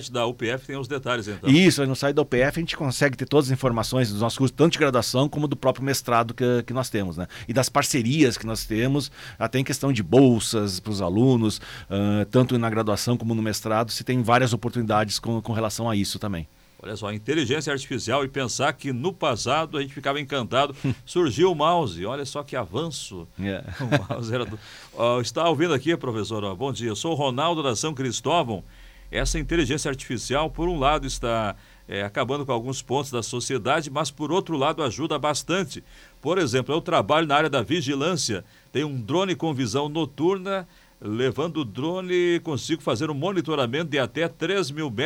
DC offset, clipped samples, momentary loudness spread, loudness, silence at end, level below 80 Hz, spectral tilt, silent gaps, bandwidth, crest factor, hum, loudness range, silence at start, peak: under 0.1%; under 0.1%; 10 LU; -24 LUFS; 0 s; -46 dBFS; -5 dB/octave; none; 17 kHz; 16 dB; none; 4 LU; 0 s; -6 dBFS